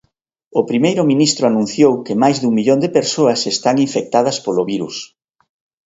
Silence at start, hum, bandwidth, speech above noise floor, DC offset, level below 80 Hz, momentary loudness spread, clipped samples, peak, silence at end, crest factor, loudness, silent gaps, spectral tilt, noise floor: 0.55 s; none; 8 kHz; 51 dB; under 0.1%; -60 dBFS; 8 LU; under 0.1%; 0 dBFS; 0.8 s; 16 dB; -15 LUFS; none; -4.5 dB/octave; -66 dBFS